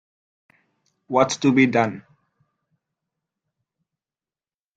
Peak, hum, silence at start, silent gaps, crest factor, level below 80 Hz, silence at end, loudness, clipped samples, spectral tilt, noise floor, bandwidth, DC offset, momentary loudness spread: -2 dBFS; none; 1.1 s; none; 22 dB; -68 dBFS; 2.75 s; -20 LUFS; under 0.1%; -5 dB/octave; under -90 dBFS; 9 kHz; under 0.1%; 9 LU